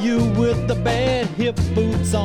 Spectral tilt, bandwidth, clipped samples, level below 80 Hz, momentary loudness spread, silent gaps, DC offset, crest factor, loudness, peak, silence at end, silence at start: -6.5 dB/octave; 17 kHz; under 0.1%; -32 dBFS; 3 LU; none; under 0.1%; 12 dB; -20 LUFS; -6 dBFS; 0 s; 0 s